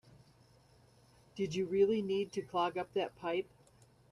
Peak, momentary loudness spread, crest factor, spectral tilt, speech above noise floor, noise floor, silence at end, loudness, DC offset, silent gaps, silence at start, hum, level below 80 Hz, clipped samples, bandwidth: -20 dBFS; 9 LU; 18 dB; -6 dB/octave; 30 dB; -65 dBFS; 0.7 s; -35 LUFS; under 0.1%; none; 1.35 s; none; -72 dBFS; under 0.1%; 11 kHz